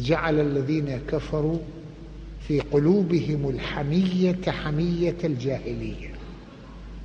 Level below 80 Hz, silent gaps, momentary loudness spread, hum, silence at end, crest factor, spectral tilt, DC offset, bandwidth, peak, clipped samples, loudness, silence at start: -40 dBFS; none; 20 LU; none; 0 s; 16 dB; -8 dB/octave; under 0.1%; 7.8 kHz; -8 dBFS; under 0.1%; -25 LUFS; 0 s